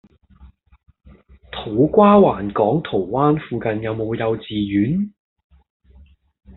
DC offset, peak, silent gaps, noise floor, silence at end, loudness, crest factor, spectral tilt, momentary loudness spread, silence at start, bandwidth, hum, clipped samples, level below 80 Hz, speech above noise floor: under 0.1%; -2 dBFS; none; -49 dBFS; 1.5 s; -18 LUFS; 18 dB; -6.5 dB/octave; 12 LU; 0.4 s; 4.1 kHz; none; under 0.1%; -48 dBFS; 32 dB